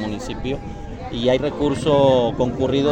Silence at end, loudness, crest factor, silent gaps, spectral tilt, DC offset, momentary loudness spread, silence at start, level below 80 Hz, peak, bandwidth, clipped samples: 0 s; -20 LUFS; 16 dB; none; -6.5 dB/octave; under 0.1%; 14 LU; 0 s; -38 dBFS; -4 dBFS; 9.4 kHz; under 0.1%